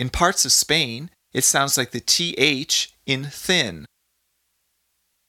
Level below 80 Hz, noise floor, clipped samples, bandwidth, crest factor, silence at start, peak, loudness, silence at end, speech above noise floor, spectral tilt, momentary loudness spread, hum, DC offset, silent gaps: -46 dBFS; -71 dBFS; under 0.1%; 18 kHz; 22 dB; 0 s; -2 dBFS; -19 LUFS; 1.4 s; 50 dB; -1.5 dB/octave; 10 LU; none; under 0.1%; none